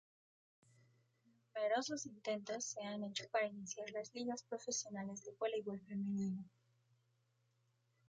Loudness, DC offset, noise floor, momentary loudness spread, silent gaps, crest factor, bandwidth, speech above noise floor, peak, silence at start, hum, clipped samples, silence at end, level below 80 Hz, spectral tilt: -43 LUFS; under 0.1%; -80 dBFS; 8 LU; none; 20 dB; 9.6 kHz; 37 dB; -24 dBFS; 1.55 s; none; under 0.1%; 1.6 s; -88 dBFS; -3.5 dB/octave